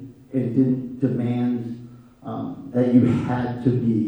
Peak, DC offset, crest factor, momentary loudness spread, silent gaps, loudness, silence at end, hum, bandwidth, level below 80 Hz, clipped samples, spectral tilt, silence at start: -4 dBFS; under 0.1%; 18 dB; 15 LU; none; -22 LUFS; 0 s; none; 5.4 kHz; -56 dBFS; under 0.1%; -10 dB/octave; 0 s